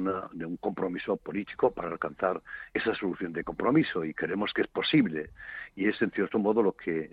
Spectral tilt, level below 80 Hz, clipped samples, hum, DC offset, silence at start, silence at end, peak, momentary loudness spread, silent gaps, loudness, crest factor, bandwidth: -8.5 dB/octave; -60 dBFS; under 0.1%; none; under 0.1%; 0 s; 0.05 s; -12 dBFS; 10 LU; none; -30 LUFS; 18 dB; 5 kHz